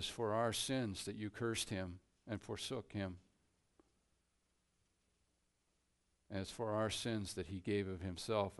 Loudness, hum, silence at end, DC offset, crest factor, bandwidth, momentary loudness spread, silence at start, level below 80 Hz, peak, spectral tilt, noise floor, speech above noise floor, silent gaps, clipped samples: -42 LUFS; none; 0 s; under 0.1%; 20 dB; 11.5 kHz; 11 LU; 0 s; -68 dBFS; -22 dBFS; -4.5 dB/octave; -82 dBFS; 41 dB; none; under 0.1%